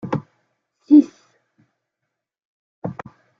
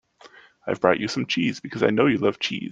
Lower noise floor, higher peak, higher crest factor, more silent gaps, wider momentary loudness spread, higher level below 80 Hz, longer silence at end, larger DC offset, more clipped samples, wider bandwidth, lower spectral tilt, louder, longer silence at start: first, -81 dBFS vs -51 dBFS; about the same, -2 dBFS vs -2 dBFS; about the same, 20 dB vs 22 dB; first, 2.45-2.82 s vs none; first, 20 LU vs 8 LU; about the same, -66 dBFS vs -62 dBFS; first, 0.5 s vs 0 s; neither; neither; second, 6.2 kHz vs 9 kHz; first, -9 dB/octave vs -5.5 dB/octave; first, -16 LUFS vs -23 LUFS; second, 0.05 s vs 0.25 s